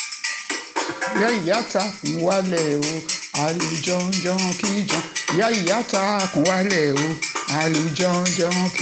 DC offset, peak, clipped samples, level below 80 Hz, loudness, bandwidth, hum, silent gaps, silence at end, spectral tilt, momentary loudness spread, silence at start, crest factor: under 0.1%; -4 dBFS; under 0.1%; -62 dBFS; -22 LUFS; 9.4 kHz; none; none; 0 s; -4 dB/octave; 6 LU; 0 s; 18 dB